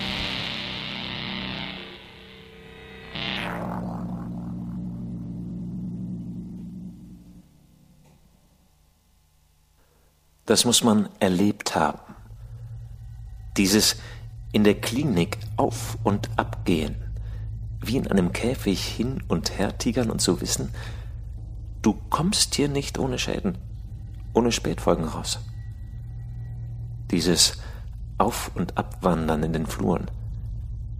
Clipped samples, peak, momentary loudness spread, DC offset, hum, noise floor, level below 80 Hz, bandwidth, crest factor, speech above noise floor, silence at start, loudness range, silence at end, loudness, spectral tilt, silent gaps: under 0.1%; -2 dBFS; 19 LU; under 0.1%; none; -61 dBFS; -40 dBFS; 15.5 kHz; 24 dB; 38 dB; 0 s; 10 LU; 0 s; -25 LUFS; -4 dB/octave; none